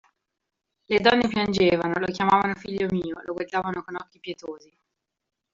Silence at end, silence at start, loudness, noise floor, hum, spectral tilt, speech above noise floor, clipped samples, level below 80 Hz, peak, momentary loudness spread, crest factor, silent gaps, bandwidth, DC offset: 1 s; 0.9 s; -24 LUFS; -83 dBFS; none; -3.5 dB/octave; 59 dB; under 0.1%; -56 dBFS; -4 dBFS; 17 LU; 22 dB; none; 7.6 kHz; under 0.1%